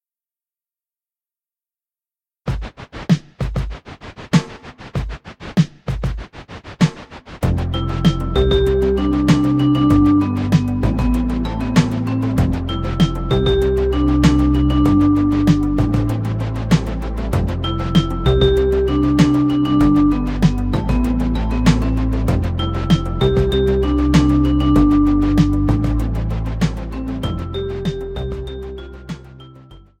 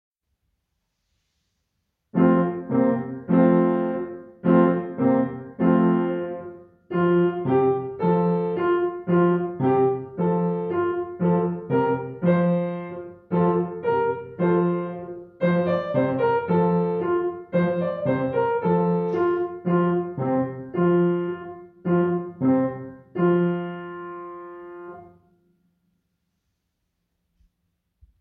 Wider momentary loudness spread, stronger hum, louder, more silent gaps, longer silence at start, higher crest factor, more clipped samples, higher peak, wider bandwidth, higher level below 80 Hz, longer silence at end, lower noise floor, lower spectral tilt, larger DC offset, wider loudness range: about the same, 14 LU vs 13 LU; neither; first, -17 LUFS vs -23 LUFS; neither; first, 2.45 s vs 2.15 s; about the same, 16 dB vs 18 dB; neither; first, 0 dBFS vs -6 dBFS; first, 13.5 kHz vs 4.3 kHz; first, -24 dBFS vs -64 dBFS; second, 0.2 s vs 3.1 s; first, under -90 dBFS vs -76 dBFS; second, -7.5 dB/octave vs -11.5 dB/octave; neither; first, 8 LU vs 4 LU